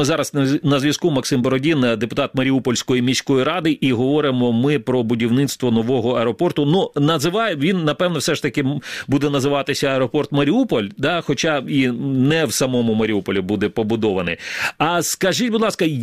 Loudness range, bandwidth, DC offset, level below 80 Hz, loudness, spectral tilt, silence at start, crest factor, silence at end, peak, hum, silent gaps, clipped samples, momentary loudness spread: 1 LU; 15 kHz; 0.2%; -52 dBFS; -18 LUFS; -5 dB/octave; 0 s; 16 dB; 0 s; -2 dBFS; none; none; under 0.1%; 3 LU